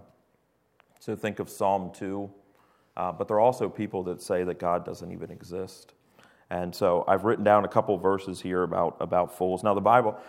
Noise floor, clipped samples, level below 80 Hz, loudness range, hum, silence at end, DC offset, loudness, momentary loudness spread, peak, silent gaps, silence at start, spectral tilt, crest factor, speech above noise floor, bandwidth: -70 dBFS; under 0.1%; -66 dBFS; 7 LU; none; 0 s; under 0.1%; -27 LUFS; 16 LU; -6 dBFS; none; 1.05 s; -6.5 dB/octave; 22 dB; 43 dB; 16 kHz